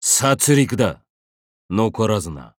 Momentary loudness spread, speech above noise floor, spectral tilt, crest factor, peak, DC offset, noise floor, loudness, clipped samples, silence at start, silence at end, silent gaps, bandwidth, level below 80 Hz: 8 LU; over 72 dB; -4 dB/octave; 18 dB; -2 dBFS; under 0.1%; under -90 dBFS; -18 LUFS; under 0.1%; 0 s; 0.1 s; 1.10-1.69 s; 19.5 kHz; -48 dBFS